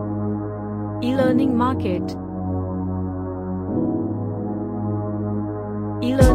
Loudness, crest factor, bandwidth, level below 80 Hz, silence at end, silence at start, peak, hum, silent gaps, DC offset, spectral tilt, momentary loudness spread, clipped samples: -24 LUFS; 20 dB; 14.5 kHz; -34 dBFS; 0 s; 0 s; 0 dBFS; none; none; under 0.1%; -8 dB/octave; 9 LU; under 0.1%